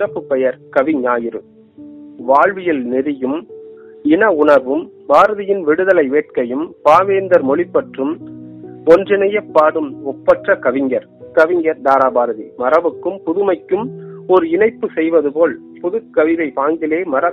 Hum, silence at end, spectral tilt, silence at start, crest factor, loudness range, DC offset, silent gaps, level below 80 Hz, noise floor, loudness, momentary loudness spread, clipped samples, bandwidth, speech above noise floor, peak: none; 0 s; -7 dB/octave; 0 s; 14 dB; 3 LU; under 0.1%; none; -58 dBFS; -37 dBFS; -15 LUFS; 10 LU; under 0.1%; 7.8 kHz; 23 dB; 0 dBFS